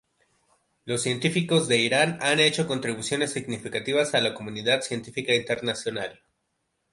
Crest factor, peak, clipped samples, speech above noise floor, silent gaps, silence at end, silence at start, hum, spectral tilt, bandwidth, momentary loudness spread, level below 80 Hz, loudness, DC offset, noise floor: 18 dB; -8 dBFS; under 0.1%; 51 dB; none; 0.8 s; 0.85 s; none; -3.5 dB/octave; 11.5 kHz; 10 LU; -66 dBFS; -25 LUFS; under 0.1%; -76 dBFS